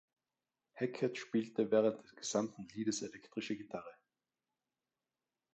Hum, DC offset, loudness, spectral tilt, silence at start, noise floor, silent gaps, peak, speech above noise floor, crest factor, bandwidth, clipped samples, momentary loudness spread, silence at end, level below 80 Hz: none; under 0.1%; -38 LUFS; -4.5 dB/octave; 0.75 s; under -90 dBFS; none; -20 dBFS; over 52 dB; 20 dB; 8.8 kHz; under 0.1%; 13 LU; 1.6 s; -82 dBFS